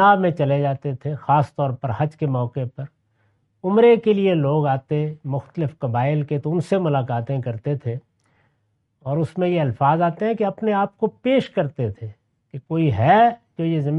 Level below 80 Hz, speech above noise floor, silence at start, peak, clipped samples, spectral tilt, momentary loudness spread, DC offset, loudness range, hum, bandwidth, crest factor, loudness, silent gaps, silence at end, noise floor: -60 dBFS; 49 dB; 0 s; -4 dBFS; under 0.1%; -9 dB/octave; 12 LU; under 0.1%; 4 LU; none; 8.8 kHz; 16 dB; -21 LUFS; none; 0 s; -69 dBFS